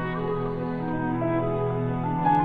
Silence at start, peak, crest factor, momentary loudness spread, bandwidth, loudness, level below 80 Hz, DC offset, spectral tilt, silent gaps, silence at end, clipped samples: 0 s; -10 dBFS; 16 dB; 4 LU; 4.7 kHz; -27 LUFS; -44 dBFS; under 0.1%; -10 dB/octave; none; 0 s; under 0.1%